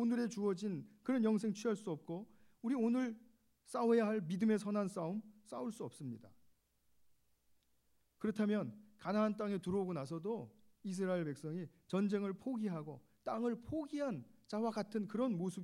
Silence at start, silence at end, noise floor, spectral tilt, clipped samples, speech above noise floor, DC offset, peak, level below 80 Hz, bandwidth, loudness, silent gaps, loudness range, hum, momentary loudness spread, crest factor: 0 s; 0 s; -76 dBFS; -7 dB/octave; under 0.1%; 38 dB; under 0.1%; -24 dBFS; -78 dBFS; 12 kHz; -40 LUFS; none; 7 LU; none; 13 LU; 16 dB